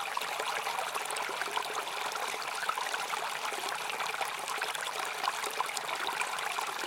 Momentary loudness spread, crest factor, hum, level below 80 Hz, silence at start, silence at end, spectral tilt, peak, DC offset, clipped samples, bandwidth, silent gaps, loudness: 2 LU; 22 dB; none; -82 dBFS; 0 s; 0 s; 0.5 dB/octave; -12 dBFS; under 0.1%; under 0.1%; 17 kHz; none; -34 LUFS